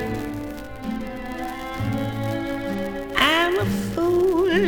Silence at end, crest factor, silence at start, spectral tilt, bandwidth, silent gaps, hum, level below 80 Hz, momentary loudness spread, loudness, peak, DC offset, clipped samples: 0 s; 20 dB; 0 s; -5.5 dB/octave; 19.5 kHz; none; none; -42 dBFS; 13 LU; -24 LUFS; -4 dBFS; under 0.1%; under 0.1%